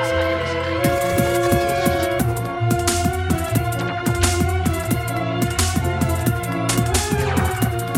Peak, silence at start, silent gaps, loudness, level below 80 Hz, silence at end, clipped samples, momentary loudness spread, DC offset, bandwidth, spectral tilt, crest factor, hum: -2 dBFS; 0 s; none; -20 LUFS; -32 dBFS; 0 s; under 0.1%; 4 LU; under 0.1%; over 20 kHz; -5 dB/octave; 16 dB; none